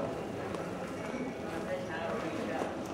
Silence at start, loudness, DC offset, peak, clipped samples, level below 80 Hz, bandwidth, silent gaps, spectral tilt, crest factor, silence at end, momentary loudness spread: 0 s; -37 LUFS; under 0.1%; -20 dBFS; under 0.1%; -60 dBFS; 16 kHz; none; -5.5 dB/octave; 18 dB; 0 s; 3 LU